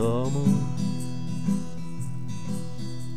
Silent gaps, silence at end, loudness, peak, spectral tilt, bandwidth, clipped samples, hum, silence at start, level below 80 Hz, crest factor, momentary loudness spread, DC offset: none; 0 s; -29 LUFS; -10 dBFS; -7.5 dB/octave; 15 kHz; under 0.1%; none; 0 s; -52 dBFS; 18 dB; 11 LU; 3%